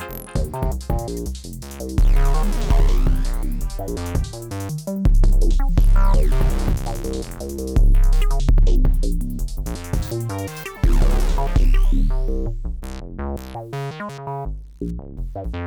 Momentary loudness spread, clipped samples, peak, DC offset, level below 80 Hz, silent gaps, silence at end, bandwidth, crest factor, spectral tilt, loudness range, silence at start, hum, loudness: 12 LU; under 0.1%; -8 dBFS; under 0.1%; -18 dBFS; none; 0 s; 16 kHz; 8 dB; -6.5 dB/octave; 4 LU; 0 s; none; -23 LUFS